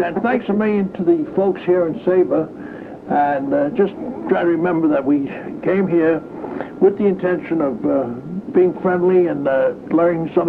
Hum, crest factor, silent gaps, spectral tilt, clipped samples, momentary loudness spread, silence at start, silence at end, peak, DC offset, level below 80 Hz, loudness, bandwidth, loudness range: none; 14 dB; none; -10 dB/octave; under 0.1%; 10 LU; 0 s; 0 s; -4 dBFS; under 0.1%; -56 dBFS; -18 LUFS; 4.3 kHz; 1 LU